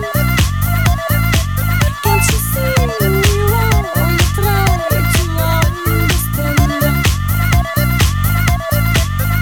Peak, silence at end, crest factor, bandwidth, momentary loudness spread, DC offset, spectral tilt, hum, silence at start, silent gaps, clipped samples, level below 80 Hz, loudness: 0 dBFS; 0 s; 14 dB; over 20 kHz; 2 LU; 0.4%; -5 dB/octave; none; 0 s; none; under 0.1%; -20 dBFS; -14 LUFS